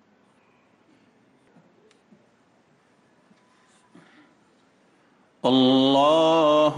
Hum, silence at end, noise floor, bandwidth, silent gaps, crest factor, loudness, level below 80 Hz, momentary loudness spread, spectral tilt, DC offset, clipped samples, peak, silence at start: none; 0 s; -61 dBFS; 10 kHz; none; 16 dB; -19 LUFS; -72 dBFS; 4 LU; -5.5 dB/octave; under 0.1%; under 0.1%; -8 dBFS; 5.45 s